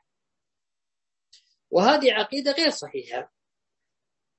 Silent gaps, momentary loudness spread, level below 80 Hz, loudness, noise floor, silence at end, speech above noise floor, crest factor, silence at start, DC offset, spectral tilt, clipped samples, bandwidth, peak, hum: none; 15 LU; -74 dBFS; -22 LUFS; -90 dBFS; 1.15 s; 67 dB; 24 dB; 1.7 s; under 0.1%; -3.5 dB/octave; under 0.1%; 8.4 kHz; -2 dBFS; none